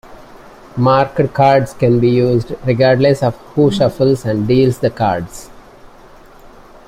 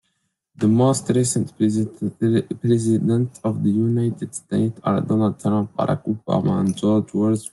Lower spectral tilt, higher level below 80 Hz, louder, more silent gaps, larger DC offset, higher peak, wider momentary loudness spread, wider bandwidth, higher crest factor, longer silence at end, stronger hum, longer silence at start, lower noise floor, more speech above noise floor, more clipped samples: about the same, -7.5 dB/octave vs -7 dB/octave; first, -42 dBFS vs -60 dBFS; first, -14 LUFS vs -21 LUFS; neither; neither; about the same, -2 dBFS vs -4 dBFS; about the same, 7 LU vs 5 LU; first, 15 kHz vs 12 kHz; about the same, 14 dB vs 16 dB; first, 1.25 s vs 0.05 s; neither; second, 0.05 s vs 0.6 s; second, -40 dBFS vs -72 dBFS; second, 27 dB vs 52 dB; neither